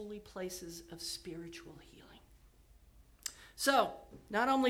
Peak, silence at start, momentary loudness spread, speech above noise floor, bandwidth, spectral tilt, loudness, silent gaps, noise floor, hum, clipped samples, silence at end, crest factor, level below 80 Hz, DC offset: -16 dBFS; 0 s; 24 LU; 27 dB; 18.5 kHz; -3 dB/octave; -37 LUFS; none; -63 dBFS; none; under 0.1%; 0 s; 22 dB; -64 dBFS; under 0.1%